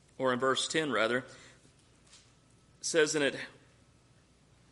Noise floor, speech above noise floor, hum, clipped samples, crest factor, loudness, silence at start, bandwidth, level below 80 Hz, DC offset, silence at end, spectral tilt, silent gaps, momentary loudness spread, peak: -64 dBFS; 33 dB; none; under 0.1%; 22 dB; -31 LUFS; 0.2 s; 11.5 kHz; -72 dBFS; under 0.1%; 1.2 s; -2.5 dB/octave; none; 14 LU; -14 dBFS